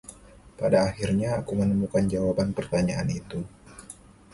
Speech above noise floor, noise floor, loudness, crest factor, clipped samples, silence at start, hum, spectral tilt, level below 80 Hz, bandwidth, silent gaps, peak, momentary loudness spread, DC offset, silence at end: 24 dB; -49 dBFS; -26 LUFS; 18 dB; under 0.1%; 0.1 s; none; -7 dB/octave; -48 dBFS; 11.5 kHz; none; -8 dBFS; 21 LU; under 0.1%; 0.4 s